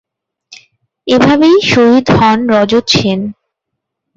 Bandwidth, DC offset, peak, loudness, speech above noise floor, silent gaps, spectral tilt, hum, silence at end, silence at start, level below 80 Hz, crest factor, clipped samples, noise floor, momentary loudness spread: 7.8 kHz; under 0.1%; 0 dBFS; -9 LUFS; 67 dB; none; -5.5 dB/octave; none; 0.85 s; 0.5 s; -40 dBFS; 12 dB; under 0.1%; -75 dBFS; 10 LU